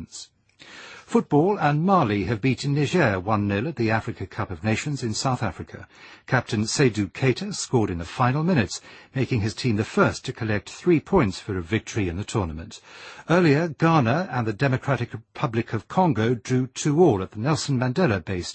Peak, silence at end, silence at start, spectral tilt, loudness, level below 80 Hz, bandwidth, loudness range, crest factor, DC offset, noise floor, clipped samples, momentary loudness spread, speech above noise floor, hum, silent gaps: -4 dBFS; 0 s; 0 s; -6 dB/octave; -23 LUFS; -50 dBFS; 8.8 kHz; 3 LU; 20 dB; under 0.1%; -47 dBFS; under 0.1%; 12 LU; 24 dB; none; none